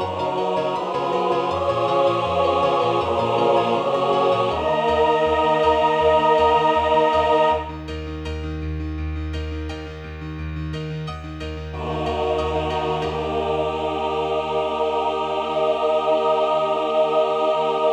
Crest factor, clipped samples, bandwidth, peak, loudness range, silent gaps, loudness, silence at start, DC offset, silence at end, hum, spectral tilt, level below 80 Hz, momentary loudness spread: 14 dB; under 0.1%; 9.6 kHz; -6 dBFS; 11 LU; none; -21 LUFS; 0 s; under 0.1%; 0 s; none; -6 dB/octave; -38 dBFS; 12 LU